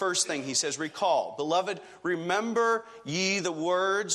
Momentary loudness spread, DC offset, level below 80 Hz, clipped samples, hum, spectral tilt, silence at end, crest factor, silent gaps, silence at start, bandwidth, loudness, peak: 6 LU; under 0.1%; -76 dBFS; under 0.1%; none; -2.5 dB/octave; 0 s; 16 dB; none; 0 s; 13.5 kHz; -28 LUFS; -12 dBFS